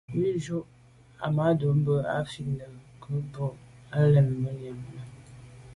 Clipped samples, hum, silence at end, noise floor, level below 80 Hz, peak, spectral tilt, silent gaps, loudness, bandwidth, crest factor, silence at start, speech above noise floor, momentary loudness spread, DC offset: under 0.1%; none; 0 s; -48 dBFS; -58 dBFS; -12 dBFS; -8.5 dB/octave; none; -28 LUFS; 11 kHz; 16 dB; 0.1 s; 21 dB; 22 LU; under 0.1%